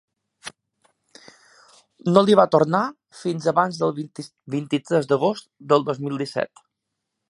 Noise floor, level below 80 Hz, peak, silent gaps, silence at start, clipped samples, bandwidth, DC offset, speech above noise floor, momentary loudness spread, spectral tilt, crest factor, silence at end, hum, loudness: -81 dBFS; -70 dBFS; 0 dBFS; none; 0.45 s; under 0.1%; 11.5 kHz; under 0.1%; 60 dB; 19 LU; -6.5 dB/octave; 22 dB; 0.85 s; none; -21 LUFS